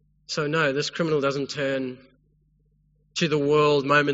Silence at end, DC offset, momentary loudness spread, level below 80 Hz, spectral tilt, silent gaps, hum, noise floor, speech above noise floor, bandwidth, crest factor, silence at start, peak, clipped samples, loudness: 0 s; under 0.1%; 11 LU; -62 dBFS; -3.5 dB/octave; none; none; -64 dBFS; 41 dB; 8 kHz; 20 dB; 0.3 s; -6 dBFS; under 0.1%; -24 LUFS